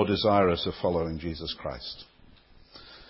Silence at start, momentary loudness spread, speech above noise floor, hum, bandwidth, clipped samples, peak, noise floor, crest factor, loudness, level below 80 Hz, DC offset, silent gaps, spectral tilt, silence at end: 0 s; 17 LU; 27 dB; none; 5.8 kHz; under 0.1%; -8 dBFS; -55 dBFS; 20 dB; -28 LUFS; -46 dBFS; under 0.1%; none; -10 dB/octave; 0.05 s